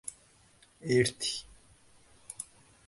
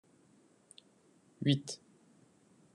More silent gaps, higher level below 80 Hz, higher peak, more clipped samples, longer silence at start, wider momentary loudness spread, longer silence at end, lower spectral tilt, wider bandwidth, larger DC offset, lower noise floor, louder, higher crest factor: neither; first, -64 dBFS vs -84 dBFS; first, -12 dBFS vs -16 dBFS; neither; second, 0.05 s vs 1.4 s; second, 17 LU vs 26 LU; second, 0.45 s vs 1 s; second, -4 dB/octave vs -5.5 dB/octave; about the same, 11.5 kHz vs 11.5 kHz; neither; second, -63 dBFS vs -67 dBFS; first, -32 LUFS vs -35 LUFS; about the same, 24 dB vs 26 dB